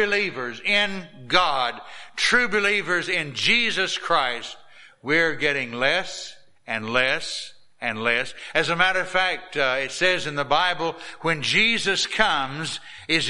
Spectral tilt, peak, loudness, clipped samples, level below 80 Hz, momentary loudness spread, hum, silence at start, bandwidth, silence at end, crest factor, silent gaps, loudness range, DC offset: -2.5 dB/octave; -2 dBFS; -22 LUFS; under 0.1%; -54 dBFS; 12 LU; none; 0 s; 11.5 kHz; 0 s; 22 dB; none; 3 LU; under 0.1%